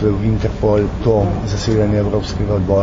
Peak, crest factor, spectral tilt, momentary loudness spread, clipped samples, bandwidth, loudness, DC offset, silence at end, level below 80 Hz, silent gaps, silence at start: -2 dBFS; 14 dB; -7.5 dB/octave; 4 LU; under 0.1%; 7.6 kHz; -17 LUFS; under 0.1%; 0 s; -26 dBFS; none; 0 s